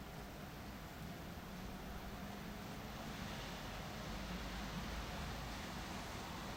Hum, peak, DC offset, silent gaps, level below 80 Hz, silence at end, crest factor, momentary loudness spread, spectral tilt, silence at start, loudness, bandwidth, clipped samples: none; -34 dBFS; under 0.1%; none; -54 dBFS; 0 s; 14 dB; 5 LU; -4.5 dB/octave; 0 s; -48 LUFS; 16 kHz; under 0.1%